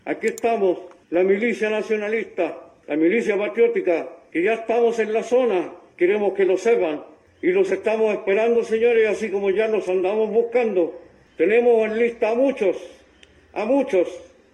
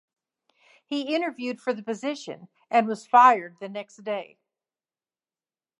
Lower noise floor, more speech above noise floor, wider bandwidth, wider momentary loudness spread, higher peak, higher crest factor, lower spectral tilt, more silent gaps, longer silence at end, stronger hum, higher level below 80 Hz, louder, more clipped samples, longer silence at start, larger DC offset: second, -52 dBFS vs under -90 dBFS; second, 32 dB vs over 66 dB; second, 9.6 kHz vs 11 kHz; second, 8 LU vs 19 LU; second, -8 dBFS vs -4 dBFS; second, 14 dB vs 22 dB; about the same, -5.5 dB/octave vs -4.5 dB/octave; neither; second, 0.25 s vs 1.55 s; neither; first, -66 dBFS vs -88 dBFS; first, -21 LUFS vs -24 LUFS; neither; second, 0.05 s vs 0.9 s; neither